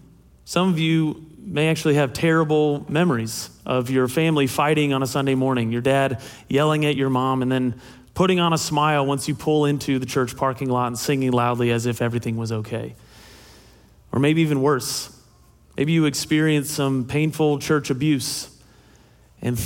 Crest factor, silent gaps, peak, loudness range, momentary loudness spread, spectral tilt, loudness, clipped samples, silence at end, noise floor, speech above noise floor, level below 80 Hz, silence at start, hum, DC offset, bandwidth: 16 dB; none; -6 dBFS; 4 LU; 9 LU; -5.5 dB/octave; -21 LUFS; under 0.1%; 0 s; -53 dBFS; 32 dB; -54 dBFS; 0.45 s; none; under 0.1%; 17 kHz